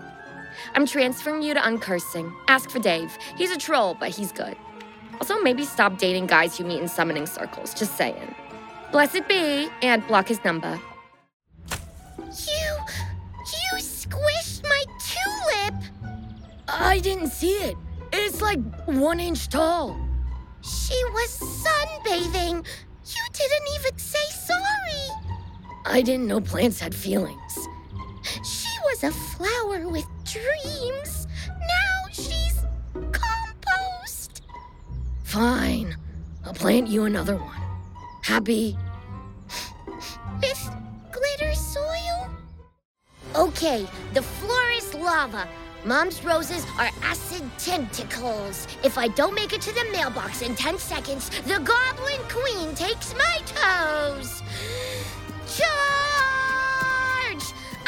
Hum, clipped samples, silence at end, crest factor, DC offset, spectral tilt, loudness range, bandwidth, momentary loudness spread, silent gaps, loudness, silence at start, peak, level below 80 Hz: none; under 0.1%; 0 s; 24 dB; under 0.1%; -3.5 dB/octave; 5 LU; 17 kHz; 15 LU; 11.33-11.40 s, 42.85-42.95 s; -25 LUFS; 0 s; -2 dBFS; -38 dBFS